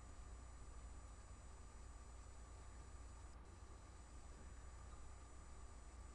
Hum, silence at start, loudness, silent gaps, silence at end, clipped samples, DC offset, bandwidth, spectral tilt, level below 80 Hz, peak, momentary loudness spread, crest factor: none; 0 s; -60 LUFS; none; 0 s; under 0.1%; under 0.1%; 11 kHz; -4.5 dB/octave; -58 dBFS; -46 dBFS; 2 LU; 12 dB